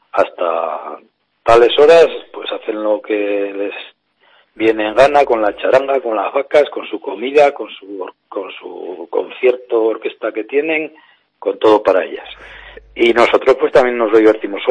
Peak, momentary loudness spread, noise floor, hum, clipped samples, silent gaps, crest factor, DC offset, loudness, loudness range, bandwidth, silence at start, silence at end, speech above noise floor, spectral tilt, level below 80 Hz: 0 dBFS; 18 LU; -53 dBFS; none; under 0.1%; none; 14 dB; under 0.1%; -14 LUFS; 5 LU; 10 kHz; 0.15 s; 0 s; 39 dB; -4.5 dB/octave; -48 dBFS